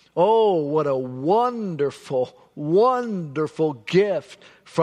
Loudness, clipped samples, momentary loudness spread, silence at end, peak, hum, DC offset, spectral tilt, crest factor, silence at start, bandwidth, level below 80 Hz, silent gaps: -22 LUFS; under 0.1%; 9 LU; 0 s; -6 dBFS; none; under 0.1%; -7 dB/octave; 16 dB; 0.15 s; 10.5 kHz; -70 dBFS; none